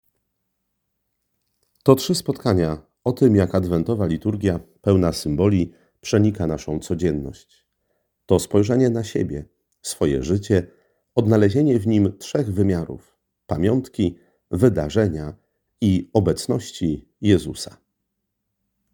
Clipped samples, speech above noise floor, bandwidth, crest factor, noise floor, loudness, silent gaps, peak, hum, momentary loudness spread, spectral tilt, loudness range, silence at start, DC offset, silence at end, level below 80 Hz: under 0.1%; 57 dB; over 20 kHz; 22 dB; -77 dBFS; -21 LUFS; none; 0 dBFS; none; 12 LU; -7 dB/octave; 3 LU; 1.85 s; under 0.1%; 1.25 s; -46 dBFS